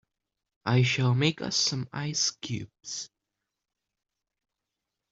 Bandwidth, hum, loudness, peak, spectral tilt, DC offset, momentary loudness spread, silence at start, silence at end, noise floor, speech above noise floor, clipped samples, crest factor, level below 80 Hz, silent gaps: 7.8 kHz; none; -28 LUFS; -10 dBFS; -4 dB/octave; under 0.1%; 13 LU; 0.65 s; 2.05 s; -86 dBFS; 59 dB; under 0.1%; 20 dB; -66 dBFS; none